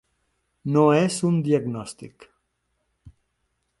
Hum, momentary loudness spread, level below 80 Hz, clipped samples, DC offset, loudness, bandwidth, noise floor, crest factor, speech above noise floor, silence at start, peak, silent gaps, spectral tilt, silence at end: none; 18 LU; -62 dBFS; under 0.1%; under 0.1%; -21 LUFS; 11.5 kHz; -74 dBFS; 20 dB; 53 dB; 0.65 s; -6 dBFS; none; -6.5 dB/octave; 0.7 s